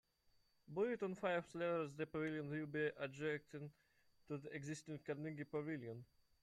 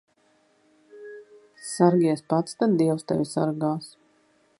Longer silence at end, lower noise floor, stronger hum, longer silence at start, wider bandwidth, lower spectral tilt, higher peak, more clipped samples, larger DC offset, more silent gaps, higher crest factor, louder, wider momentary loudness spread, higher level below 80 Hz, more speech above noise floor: second, 0.4 s vs 0.7 s; first, -78 dBFS vs -64 dBFS; neither; second, 0.7 s vs 0.95 s; about the same, 12.5 kHz vs 11.5 kHz; about the same, -6.5 dB/octave vs -6.5 dB/octave; second, -28 dBFS vs -4 dBFS; neither; neither; neither; about the same, 18 dB vs 22 dB; second, -46 LUFS vs -24 LUFS; second, 10 LU vs 23 LU; second, -80 dBFS vs -70 dBFS; second, 33 dB vs 41 dB